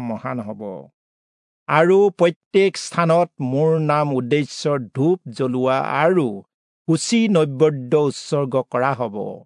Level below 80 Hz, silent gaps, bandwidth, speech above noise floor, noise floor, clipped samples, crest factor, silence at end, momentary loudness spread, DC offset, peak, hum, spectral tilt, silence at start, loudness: -72 dBFS; 0.94-1.66 s, 2.36-2.51 s, 6.54-6.85 s; 11 kHz; over 71 dB; under -90 dBFS; under 0.1%; 16 dB; 0.05 s; 11 LU; under 0.1%; -2 dBFS; none; -6 dB/octave; 0 s; -19 LUFS